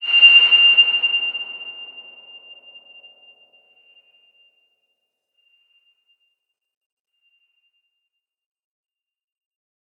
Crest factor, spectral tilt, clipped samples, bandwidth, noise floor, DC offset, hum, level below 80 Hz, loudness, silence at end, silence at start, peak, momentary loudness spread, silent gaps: 20 dB; 0.5 dB/octave; under 0.1%; 6 kHz; -80 dBFS; under 0.1%; none; under -90 dBFS; -11 LUFS; 8 s; 0 s; -2 dBFS; 25 LU; none